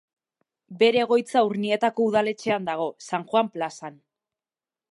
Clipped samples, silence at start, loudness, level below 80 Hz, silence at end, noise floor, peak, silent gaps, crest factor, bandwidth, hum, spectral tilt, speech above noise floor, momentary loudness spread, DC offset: under 0.1%; 0.7 s; -24 LUFS; -76 dBFS; 1 s; under -90 dBFS; -6 dBFS; none; 18 dB; 11.5 kHz; none; -5 dB/octave; over 67 dB; 11 LU; under 0.1%